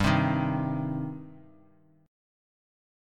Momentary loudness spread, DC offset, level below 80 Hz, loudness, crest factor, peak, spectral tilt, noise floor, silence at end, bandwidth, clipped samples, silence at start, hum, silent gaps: 18 LU; under 0.1%; -50 dBFS; -29 LUFS; 22 dB; -10 dBFS; -7 dB/octave; -61 dBFS; 1.65 s; 12.5 kHz; under 0.1%; 0 s; none; none